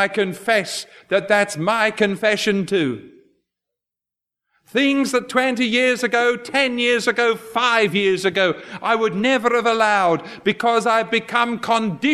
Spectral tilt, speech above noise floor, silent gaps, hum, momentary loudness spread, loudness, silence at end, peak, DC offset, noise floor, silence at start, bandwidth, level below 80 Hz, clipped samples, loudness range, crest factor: -4 dB/octave; 68 dB; none; none; 5 LU; -19 LUFS; 0 s; -2 dBFS; under 0.1%; -87 dBFS; 0 s; 14 kHz; -66 dBFS; under 0.1%; 4 LU; 18 dB